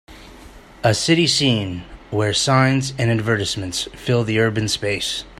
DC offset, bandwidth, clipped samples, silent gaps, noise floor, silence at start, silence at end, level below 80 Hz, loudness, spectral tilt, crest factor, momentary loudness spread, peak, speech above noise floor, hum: under 0.1%; 15.5 kHz; under 0.1%; none; -42 dBFS; 0.1 s; 0.05 s; -46 dBFS; -19 LUFS; -4.5 dB/octave; 18 dB; 9 LU; -2 dBFS; 23 dB; none